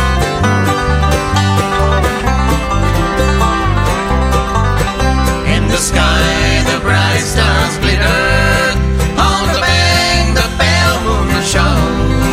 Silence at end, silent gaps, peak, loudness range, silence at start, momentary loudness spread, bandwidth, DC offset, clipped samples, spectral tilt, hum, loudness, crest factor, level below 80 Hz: 0 s; none; 0 dBFS; 2 LU; 0 s; 3 LU; 16 kHz; under 0.1%; under 0.1%; -4.5 dB/octave; none; -12 LUFS; 12 dB; -18 dBFS